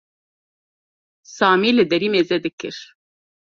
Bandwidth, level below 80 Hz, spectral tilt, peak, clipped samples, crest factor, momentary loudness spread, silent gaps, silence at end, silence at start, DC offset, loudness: 7.4 kHz; -64 dBFS; -5 dB/octave; -2 dBFS; under 0.1%; 20 dB; 16 LU; 2.53-2.58 s; 0.6 s; 1.3 s; under 0.1%; -18 LUFS